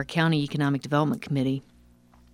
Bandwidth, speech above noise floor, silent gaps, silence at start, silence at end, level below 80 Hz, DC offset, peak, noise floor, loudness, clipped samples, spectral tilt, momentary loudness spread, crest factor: 14 kHz; 31 dB; none; 0 s; 0.75 s; -58 dBFS; under 0.1%; -8 dBFS; -56 dBFS; -26 LUFS; under 0.1%; -7 dB/octave; 4 LU; 20 dB